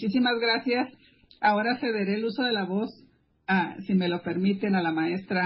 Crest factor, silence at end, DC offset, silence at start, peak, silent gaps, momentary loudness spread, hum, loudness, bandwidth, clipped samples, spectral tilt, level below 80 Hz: 16 dB; 0 s; under 0.1%; 0 s; -10 dBFS; none; 6 LU; none; -26 LUFS; 5.8 kHz; under 0.1%; -10 dB/octave; -70 dBFS